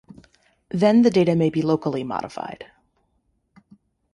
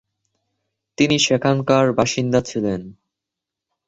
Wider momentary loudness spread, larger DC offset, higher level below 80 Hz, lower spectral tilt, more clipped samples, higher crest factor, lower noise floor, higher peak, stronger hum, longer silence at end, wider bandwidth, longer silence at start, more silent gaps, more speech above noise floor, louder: first, 17 LU vs 8 LU; neither; second, -60 dBFS vs -52 dBFS; first, -7.5 dB/octave vs -4.5 dB/octave; neither; about the same, 18 dB vs 18 dB; second, -69 dBFS vs -85 dBFS; second, -6 dBFS vs -2 dBFS; neither; first, 1.5 s vs 0.95 s; first, 11 kHz vs 8.4 kHz; second, 0.75 s vs 1 s; neither; second, 49 dB vs 67 dB; about the same, -20 LUFS vs -18 LUFS